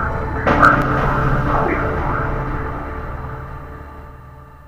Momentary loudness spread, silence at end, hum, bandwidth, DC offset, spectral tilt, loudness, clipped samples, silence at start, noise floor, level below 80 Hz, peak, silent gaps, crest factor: 22 LU; 0 s; none; 15.5 kHz; under 0.1%; -7.5 dB/octave; -18 LUFS; under 0.1%; 0 s; -39 dBFS; -26 dBFS; 0 dBFS; none; 18 dB